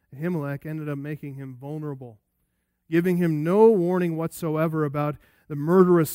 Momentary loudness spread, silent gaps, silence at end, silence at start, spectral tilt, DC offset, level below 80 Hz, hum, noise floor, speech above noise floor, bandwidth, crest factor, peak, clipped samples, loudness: 18 LU; none; 0 s; 0.1 s; -8 dB/octave; under 0.1%; -64 dBFS; none; -74 dBFS; 51 dB; 16 kHz; 20 dB; -4 dBFS; under 0.1%; -23 LUFS